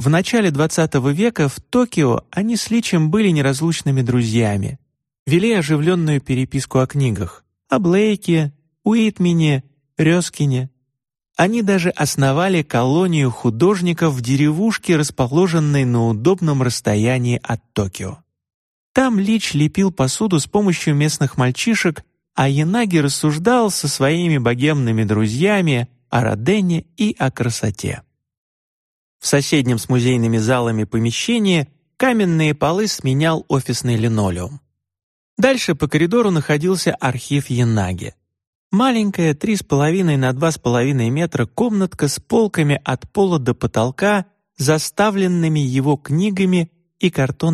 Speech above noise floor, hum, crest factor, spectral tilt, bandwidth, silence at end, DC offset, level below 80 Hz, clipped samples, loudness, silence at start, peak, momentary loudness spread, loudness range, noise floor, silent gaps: 56 dB; none; 16 dB; -5.5 dB/octave; 13 kHz; 0 s; under 0.1%; -48 dBFS; under 0.1%; -17 LUFS; 0 s; 0 dBFS; 6 LU; 3 LU; -73 dBFS; 5.19-5.26 s, 18.54-18.95 s, 28.37-29.20 s, 35.03-35.37 s, 38.47-38.71 s